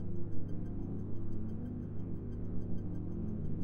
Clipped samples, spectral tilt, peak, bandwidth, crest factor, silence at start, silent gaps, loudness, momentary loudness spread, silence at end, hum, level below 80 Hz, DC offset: under 0.1%; -11.5 dB/octave; -22 dBFS; 2.1 kHz; 12 dB; 0 s; none; -42 LUFS; 2 LU; 0 s; none; -46 dBFS; under 0.1%